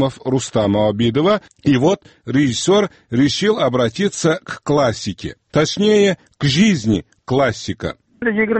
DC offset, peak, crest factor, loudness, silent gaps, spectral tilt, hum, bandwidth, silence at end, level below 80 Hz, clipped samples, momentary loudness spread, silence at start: under 0.1%; -2 dBFS; 14 dB; -17 LUFS; none; -5.5 dB/octave; none; 8.8 kHz; 0 s; -46 dBFS; under 0.1%; 8 LU; 0 s